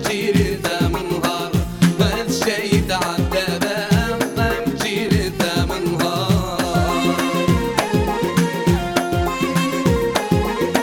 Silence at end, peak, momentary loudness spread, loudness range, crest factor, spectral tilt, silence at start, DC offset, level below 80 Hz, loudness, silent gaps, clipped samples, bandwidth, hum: 0 s; 0 dBFS; 3 LU; 1 LU; 18 dB; -5 dB/octave; 0 s; under 0.1%; -32 dBFS; -19 LUFS; none; under 0.1%; 18 kHz; none